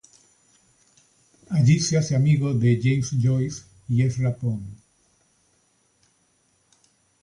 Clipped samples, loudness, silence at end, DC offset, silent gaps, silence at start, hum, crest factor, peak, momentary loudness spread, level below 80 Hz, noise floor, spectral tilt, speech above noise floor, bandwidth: under 0.1%; -22 LUFS; 2.45 s; under 0.1%; none; 1.5 s; none; 16 dB; -8 dBFS; 11 LU; -54 dBFS; -66 dBFS; -6.5 dB/octave; 45 dB; 11 kHz